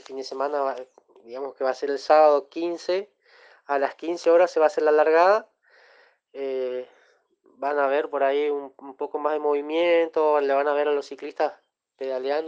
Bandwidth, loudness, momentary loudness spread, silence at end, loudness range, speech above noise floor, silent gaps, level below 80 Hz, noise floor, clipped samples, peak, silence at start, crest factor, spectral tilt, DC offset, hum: 8 kHz; -23 LUFS; 16 LU; 0 s; 5 LU; 39 dB; none; -82 dBFS; -62 dBFS; under 0.1%; -6 dBFS; 0.1 s; 18 dB; -3.5 dB/octave; under 0.1%; none